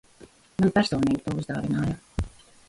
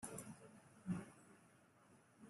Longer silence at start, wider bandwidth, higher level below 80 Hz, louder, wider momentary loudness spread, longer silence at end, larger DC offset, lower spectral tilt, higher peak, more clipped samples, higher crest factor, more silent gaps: first, 0.2 s vs 0 s; about the same, 11.5 kHz vs 12.5 kHz; first, -44 dBFS vs -80 dBFS; first, -26 LUFS vs -52 LUFS; second, 12 LU vs 20 LU; first, 0.4 s vs 0 s; neither; about the same, -6.5 dB/octave vs -5.5 dB/octave; first, -8 dBFS vs -32 dBFS; neither; about the same, 20 dB vs 22 dB; neither